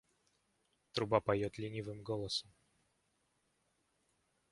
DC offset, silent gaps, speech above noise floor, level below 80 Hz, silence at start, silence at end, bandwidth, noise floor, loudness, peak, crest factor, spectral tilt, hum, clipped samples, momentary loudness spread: under 0.1%; none; 42 dB; -68 dBFS; 0.95 s; 2.1 s; 11.5 kHz; -80 dBFS; -38 LUFS; -16 dBFS; 26 dB; -5.5 dB/octave; none; under 0.1%; 10 LU